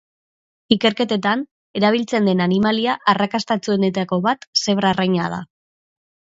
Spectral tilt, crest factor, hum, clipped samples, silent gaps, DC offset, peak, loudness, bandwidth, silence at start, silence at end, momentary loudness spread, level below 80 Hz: -5 dB/octave; 20 dB; none; under 0.1%; 1.51-1.74 s, 4.47-4.53 s; under 0.1%; 0 dBFS; -19 LUFS; 7.8 kHz; 0.7 s; 0.9 s; 4 LU; -58 dBFS